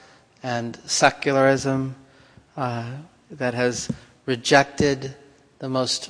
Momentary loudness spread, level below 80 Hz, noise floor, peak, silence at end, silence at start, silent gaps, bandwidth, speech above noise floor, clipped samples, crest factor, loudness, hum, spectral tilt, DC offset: 17 LU; -54 dBFS; -53 dBFS; 0 dBFS; 0 s; 0.45 s; none; 10.5 kHz; 30 dB; under 0.1%; 24 dB; -22 LUFS; none; -4 dB/octave; under 0.1%